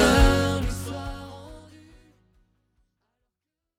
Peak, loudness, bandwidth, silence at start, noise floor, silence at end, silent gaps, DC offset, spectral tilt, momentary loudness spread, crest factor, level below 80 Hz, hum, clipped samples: -6 dBFS; -24 LUFS; 16.5 kHz; 0 s; -85 dBFS; 2.2 s; none; under 0.1%; -5 dB/octave; 24 LU; 20 dB; -30 dBFS; none; under 0.1%